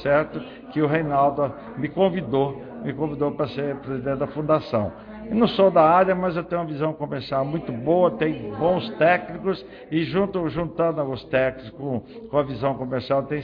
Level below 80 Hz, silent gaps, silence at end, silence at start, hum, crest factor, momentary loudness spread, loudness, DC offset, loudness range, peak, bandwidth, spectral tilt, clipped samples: -52 dBFS; none; 0 s; 0 s; none; 18 dB; 11 LU; -23 LUFS; under 0.1%; 4 LU; -6 dBFS; 5.4 kHz; -9.5 dB/octave; under 0.1%